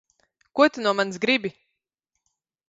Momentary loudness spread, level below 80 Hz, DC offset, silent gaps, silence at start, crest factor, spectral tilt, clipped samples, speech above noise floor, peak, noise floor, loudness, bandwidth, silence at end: 11 LU; -72 dBFS; under 0.1%; none; 0.55 s; 22 dB; -4 dB/octave; under 0.1%; 59 dB; -4 dBFS; -81 dBFS; -22 LUFS; 8 kHz; 1.2 s